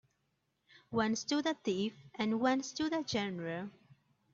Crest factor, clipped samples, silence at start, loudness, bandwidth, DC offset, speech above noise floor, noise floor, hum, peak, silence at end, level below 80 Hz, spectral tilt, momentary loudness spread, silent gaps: 18 dB; under 0.1%; 0.9 s; -35 LUFS; 7.8 kHz; under 0.1%; 46 dB; -81 dBFS; none; -18 dBFS; 0.65 s; -72 dBFS; -4.5 dB/octave; 8 LU; none